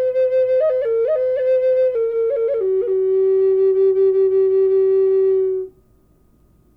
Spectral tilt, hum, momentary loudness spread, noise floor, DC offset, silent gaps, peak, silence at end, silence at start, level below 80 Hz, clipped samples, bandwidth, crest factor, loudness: -8.5 dB/octave; none; 4 LU; -54 dBFS; under 0.1%; none; -10 dBFS; 1.05 s; 0 s; -58 dBFS; under 0.1%; 3.8 kHz; 8 dB; -17 LUFS